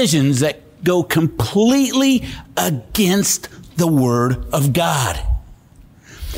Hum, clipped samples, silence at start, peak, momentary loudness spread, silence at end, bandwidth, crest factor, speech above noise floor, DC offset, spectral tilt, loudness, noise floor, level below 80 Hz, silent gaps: none; under 0.1%; 0 s; -6 dBFS; 9 LU; 0 s; 16 kHz; 12 dB; 29 dB; under 0.1%; -5 dB/octave; -17 LUFS; -46 dBFS; -32 dBFS; none